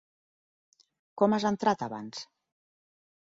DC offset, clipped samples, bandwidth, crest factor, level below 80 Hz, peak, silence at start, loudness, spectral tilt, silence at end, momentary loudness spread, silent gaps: under 0.1%; under 0.1%; 7.8 kHz; 22 dB; -72 dBFS; -10 dBFS; 1.15 s; -29 LUFS; -5.5 dB/octave; 1 s; 21 LU; none